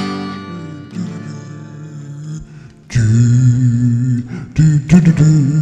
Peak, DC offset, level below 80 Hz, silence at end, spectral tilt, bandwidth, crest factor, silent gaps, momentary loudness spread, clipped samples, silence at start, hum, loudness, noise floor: 0 dBFS; under 0.1%; -38 dBFS; 0 s; -7.5 dB/octave; 8.6 kHz; 14 dB; none; 20 LU; under 0.1%; 0 s; none; -13 LUFS; -36 dBFS